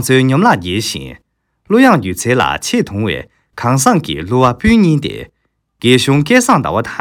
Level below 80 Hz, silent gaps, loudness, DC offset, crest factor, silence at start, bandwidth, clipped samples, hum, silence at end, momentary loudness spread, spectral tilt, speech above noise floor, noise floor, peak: -36 dBFS; none; -12 LUFS; under 0.1%; 12 dB; 0 s; 18 kHz; 0.3%; none; 0 s; 11 LU; -5 dB/octave; 37 dB; -49 dBFS; 0 dBFS